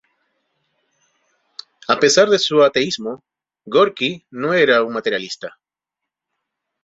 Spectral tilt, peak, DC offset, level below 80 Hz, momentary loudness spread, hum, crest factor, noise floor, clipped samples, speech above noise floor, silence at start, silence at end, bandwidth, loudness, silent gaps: -3 dB/octave; -2 dBFS; under 0.1%; -66 dBFS; 21 LU; none; 18 dB; -84 dBFS; under 0.1%; 67 dB; 1.9 s; 1.35 s; 8.2 kHz; -16 LUFS; none